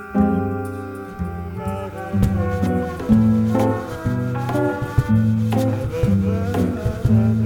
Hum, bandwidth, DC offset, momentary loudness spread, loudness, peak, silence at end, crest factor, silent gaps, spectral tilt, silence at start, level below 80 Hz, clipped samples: none; 17 kHz; under 0.1%; 11 LU; -20 LUFS; -2 dBFS; 0 s; 16 dB; none; -8.5 dB/octave; 0 s; -34 dBFS; under 0.1%